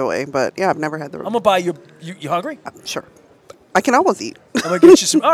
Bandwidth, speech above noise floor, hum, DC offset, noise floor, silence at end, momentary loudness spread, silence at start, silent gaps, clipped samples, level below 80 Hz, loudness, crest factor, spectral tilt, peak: 15 kHz; 29 dB; none; under 0.1%; -45 dBFS; 0 s; 20 LU; 0 s; none; 0.1%; -58 dBFS; -16 LUFS; 16 dB; -4 dB/octave; 0 dBFS